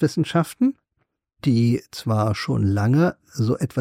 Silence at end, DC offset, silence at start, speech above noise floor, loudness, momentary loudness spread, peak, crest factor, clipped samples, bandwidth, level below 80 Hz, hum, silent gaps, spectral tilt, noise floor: 0 s; under 0.1%; 0 s; 53 dB; -22 LUFS; 6 LU; -8 dBFS; 14 dB; under 0.1%; 15.5 kHz; -54 dBFS; none; none; -7 dB/octave; -73 dBFS